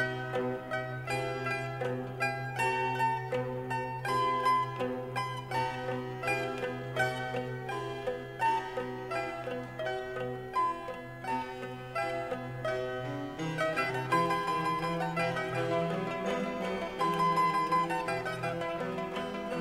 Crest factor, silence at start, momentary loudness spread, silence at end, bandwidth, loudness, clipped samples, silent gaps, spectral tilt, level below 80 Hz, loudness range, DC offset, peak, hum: 18 dB; 0 s; 8 LU; 0 s; 16 kHz; -33 LUFS; under 0.1%; none; -5.5 dB/octave; -62 dBFS; 4 LU; under 0.1%; -14 dBFS; none